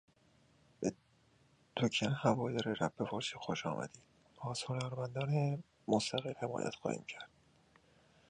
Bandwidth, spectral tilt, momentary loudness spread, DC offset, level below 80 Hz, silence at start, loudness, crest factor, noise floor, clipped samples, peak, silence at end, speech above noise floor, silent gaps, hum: 10.5 kHz; -5.5 dB/octave; 10 LU; under 0.1%; -72 dBFS; 0.8 s; -38 LUFS; 24 dB; -70 dBFS; under 0.1%; -16 dBFS; 1.05 s; 33 dB; none; none